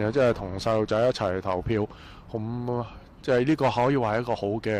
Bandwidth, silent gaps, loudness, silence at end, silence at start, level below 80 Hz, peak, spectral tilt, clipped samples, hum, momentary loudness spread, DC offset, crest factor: 12.5 kHz; none; -26 LUFS; 0 s; 0 s; -48 dBFS; -14 dBFS; -7 dB/octave; under 0.1%; none; 12 LU; under 0.1%; 12 dB